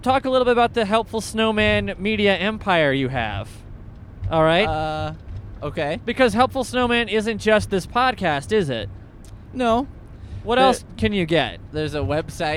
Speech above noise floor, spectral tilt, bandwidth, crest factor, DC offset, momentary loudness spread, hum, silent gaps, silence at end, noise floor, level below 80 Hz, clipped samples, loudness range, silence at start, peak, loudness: 20 dB; -5 dB/octave; 15.5 kHz; 18 dB; under 0.1%; 16 LU; none; none; 0 s; -40 dBFS; -40 dBFS; under 0.1%; 3 LU; 0 s; -2 dBFS; -20 LUFS